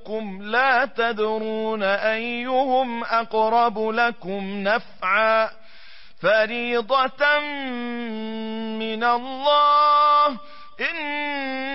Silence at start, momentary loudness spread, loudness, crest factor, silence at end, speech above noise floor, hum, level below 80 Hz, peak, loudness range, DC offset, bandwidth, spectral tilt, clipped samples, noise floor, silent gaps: 0.05 s; 13 LU; -21 LUFS; 14 dB; 0 s; 27 dB; none; -62 dBFS; -8 dBFS; 3 LU; 1%; 5.8 kHz; -8 dB/octave; under 0.1%; -49 dBFS; none